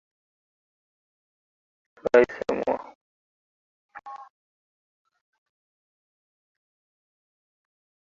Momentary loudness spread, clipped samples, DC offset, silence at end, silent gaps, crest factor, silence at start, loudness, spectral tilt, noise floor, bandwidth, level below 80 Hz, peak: 24 LU; under 0.1%; under 0.1%; 3.95 s; 2.95-3.89 s; 28 dB; 2.05 s; -24 LUFS; -3.5 dB/octave; under -90 dBFS; 7.4 kHz; -66 dBFS; -4 dBFS